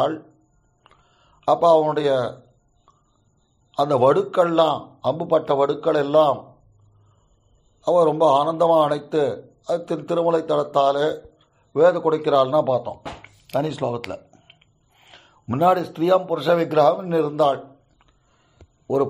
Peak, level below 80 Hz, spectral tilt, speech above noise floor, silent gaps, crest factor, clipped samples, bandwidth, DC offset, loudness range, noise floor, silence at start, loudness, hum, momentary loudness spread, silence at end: -4 dBFS; -62 dBFS; -7 dB/octave; 43 dB; none; 16 dB; under 0.1%; 13 kHz; under 0.1%; 4 LU; -63 dBFS; 0 s; -20 LUFS; none; 12 LU; 0 s